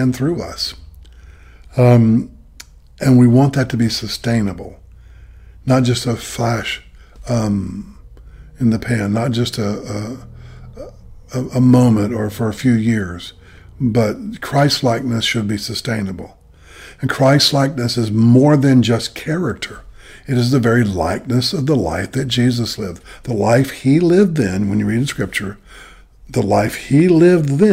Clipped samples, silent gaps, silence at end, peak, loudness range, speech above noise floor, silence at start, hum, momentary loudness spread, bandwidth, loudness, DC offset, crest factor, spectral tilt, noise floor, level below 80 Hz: under 0.1%; none; 0 s; -2 dBFS; 6 LU; 26 dB; 0 s; none; 16 LU; 16 kHz; -16 LUFS; under 0.1%; 14 dB; -6 dB/octave; -41 dBFS; -42 dBFS